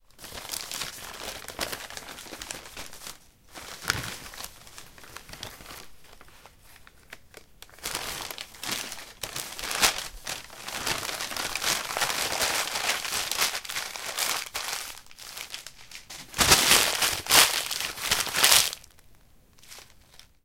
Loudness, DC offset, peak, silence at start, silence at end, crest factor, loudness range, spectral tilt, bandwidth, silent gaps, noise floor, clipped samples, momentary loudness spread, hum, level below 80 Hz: -25 LUFS; 0.1%; 0 dBFS; 0.2 s; 0.25 s; 30 dB; 17 LU; 0 dB/octave; 17 kHz; none; -57 dBFS; under 0.1%; 24 LU; none; -52 dBFS